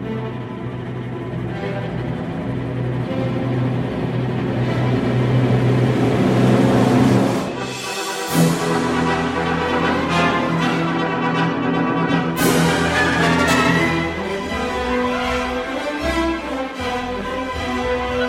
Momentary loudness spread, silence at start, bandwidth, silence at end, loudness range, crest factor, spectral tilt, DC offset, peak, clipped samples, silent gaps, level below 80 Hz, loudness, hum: 10 LU; 0 s; 16 kHz; 0 s; 6 LU; 18 dB; -6 dB/octave; under 0.1%; -2 dBFS; under 0.1%; none; -38 dBFS; -19 LUFS; none